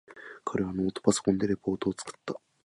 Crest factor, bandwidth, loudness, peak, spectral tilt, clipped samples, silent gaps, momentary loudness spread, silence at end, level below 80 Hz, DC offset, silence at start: 22 dB; 11.5 kHz; -30 LUFS; -8 dBFS; -5.5 dB/octave; under 0.1%; none; 13 LU; 0.3 s; -58 dBFS; under 0.1%; 0.1 s